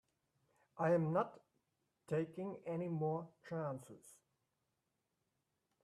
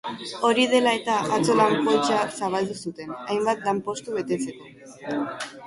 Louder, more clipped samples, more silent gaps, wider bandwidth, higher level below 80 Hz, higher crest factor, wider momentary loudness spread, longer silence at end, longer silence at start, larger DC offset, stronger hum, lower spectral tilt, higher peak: second, -41 LUFS vs -24 LUFS; neither; neither; first, 13 kHz vs 11.5 kHz; second, -86 dBFS vs -66 dBFS; about the same, 20 dB vs 18 dB; about the same, 16 LU vs 14 LU; first, 1.7 s vs 0 s; first, 0.75 s vs 0.05 s; neither; neither; first, -8.5 dB/octave vs -4 dB/octave; second, -22 dBFS vs -6 dBFS